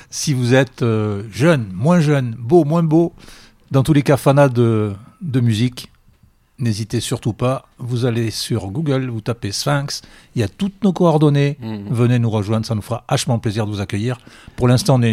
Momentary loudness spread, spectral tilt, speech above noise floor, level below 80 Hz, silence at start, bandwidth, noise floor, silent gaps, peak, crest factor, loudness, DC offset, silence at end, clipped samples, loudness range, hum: 10 LU; -6.5 dB/octave; 36 dB; -48 dBFS; 0.1 s; 15.5 kHz; -53 dBFS; none; -2 dBFS; 16 dB; -18 LUFS; under 0.1%; 0 s; under 0.1%; 5 LU; none